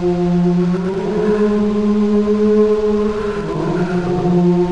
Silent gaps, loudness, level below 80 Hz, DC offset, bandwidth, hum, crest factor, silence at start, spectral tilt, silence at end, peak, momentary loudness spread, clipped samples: none; -16 LUFS; -38 dBFS; 1%; 8.4 kHz; none; 10 dB; 0 s; -8.5 dB/octave; 0 s; -6 dBFS; 5 LU; under 0.1%